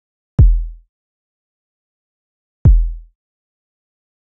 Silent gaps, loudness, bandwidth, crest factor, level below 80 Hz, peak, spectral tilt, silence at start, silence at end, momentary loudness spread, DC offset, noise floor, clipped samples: 0.89-2.65 s; -16 LUFS; 1.5 kHz; 16 dB; -18 dBFS; -2 dBFS; -14 dB/octave; 0.4 s; 1.3 s; 12 LU; under 0.1%; under -90 dBFS; under 0.1%